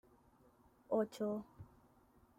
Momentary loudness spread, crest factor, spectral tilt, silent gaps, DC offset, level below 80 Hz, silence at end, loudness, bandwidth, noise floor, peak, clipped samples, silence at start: 23 LU; 20 dB; -7 dB/octave; none; under 0.1%; -76 dBFS; 0.75 s; -41 LUFS; 16 kHz; -69 dBFS; -24 dBFS; under 0.1%; 0.9 s